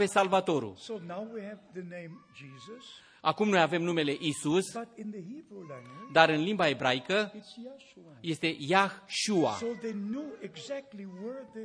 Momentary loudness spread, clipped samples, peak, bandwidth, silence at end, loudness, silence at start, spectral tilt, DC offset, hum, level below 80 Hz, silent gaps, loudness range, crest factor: 21 LU; under 0.1%; -4 dBFS; 11 kHz; 0 s; -30 LUFS; 0 s; -4.5 dB/octave; under 0.1%; none; -76 dBFS; none; 4 LU; 26 dB